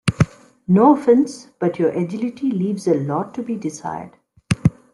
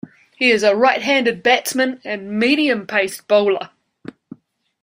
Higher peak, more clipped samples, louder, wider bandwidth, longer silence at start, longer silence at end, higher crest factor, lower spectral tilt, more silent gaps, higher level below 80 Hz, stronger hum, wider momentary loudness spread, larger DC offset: about the same, -2 dBFS vs -2 dBFS; neither; about the same, -19 LUFS vs -17 LUFS; second, 12 kHz vs 16 kHz; about the same, 0.05 s vs 0.05 s; second, 0.2 s vs 1.15 s; about the same, 18 dB vs 16 dB; first, -7.5 dB/octave vs -3.5 dB/octave; neither; first, -46 dBFS vs -66 dBFS; neither; first, 13 LU vs 10 LU; neither